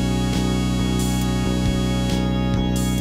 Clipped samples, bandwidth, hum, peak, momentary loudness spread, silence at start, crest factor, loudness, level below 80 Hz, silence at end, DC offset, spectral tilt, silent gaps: under 0.1%; 16 kHz; none; -10 dBFS; 0 LU; 0 s; 10 dB; -21 LUFS; -28 dBFS; 0 s; under 0.1%; -5.5 dB/octave; none